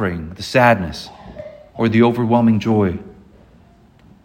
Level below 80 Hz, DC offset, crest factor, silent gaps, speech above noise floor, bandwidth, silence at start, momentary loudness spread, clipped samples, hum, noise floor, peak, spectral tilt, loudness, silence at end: -46 dBFS; under 0.1%; 18 dB; none; 33 dB; 15.5 kHz; 0 s; 21 LU; under 0.1%; none; -49 dBFS; 0 dBFS; -7 dB/octave; -16 LUFS; 1.15 s